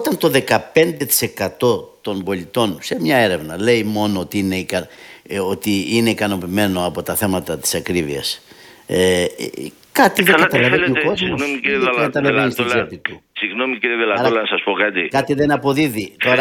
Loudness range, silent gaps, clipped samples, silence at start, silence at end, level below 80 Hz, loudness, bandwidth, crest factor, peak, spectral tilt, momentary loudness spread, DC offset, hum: 4 LU; none; under 0.1%; 0 s; 0 s; -52 dBFS; -17 LUFS; 19 kHz; 18 dB; 0 dBFS; -4 dB/octave; 9 LU; under 0.1%; none